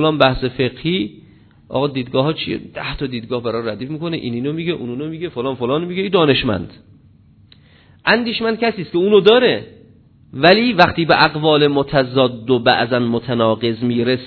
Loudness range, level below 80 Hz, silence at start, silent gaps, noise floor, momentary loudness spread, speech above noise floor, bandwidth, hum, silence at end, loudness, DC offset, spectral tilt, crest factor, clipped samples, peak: 8 LU; -44 dBFS; 0 s; none; -48 dBFS; 12 LU; 32 dB; 6 kHz; none; 0 s; -17 LUFS; under 0.1%; -8 dB/octave; 18 dB; under 0.1%; 0 dBFS